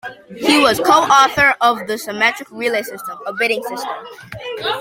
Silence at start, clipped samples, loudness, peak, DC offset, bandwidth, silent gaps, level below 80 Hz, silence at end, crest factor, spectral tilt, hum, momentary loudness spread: 0.05 s; under 0.1%; -15 LUFS; 0 dBFS; under 0.1%; 16.5 kHz; none; -52 dBFS; 0 s; 16 dB; -2.5 dB/octave; none; 17 LU